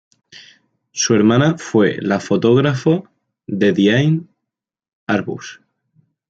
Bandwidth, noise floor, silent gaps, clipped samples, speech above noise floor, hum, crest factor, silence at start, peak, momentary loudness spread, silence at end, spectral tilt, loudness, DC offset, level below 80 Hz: 8 kHz; -82 dBFS; 4.93-5.07 s; under 0.1%; 67 dB; none; 16 dB; 0.35 s; -2 dBFS; 15 LU; 0.75 s; -5.5 dB/octave; -16 LUFS; under 0.1%; -58 dBFS